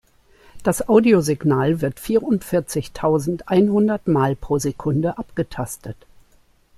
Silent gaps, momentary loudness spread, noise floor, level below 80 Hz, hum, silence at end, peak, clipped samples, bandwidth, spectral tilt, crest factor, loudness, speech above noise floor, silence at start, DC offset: none; 11 LU; -56 dBFS; -46 dBFS; none; 0.85 s; -2 dBFS; under 0.1%; 14.5 kHz; -6.5 dB/octave; 18 dB; -20 LUFS; 37 dB; 0.55 s; under 0.1%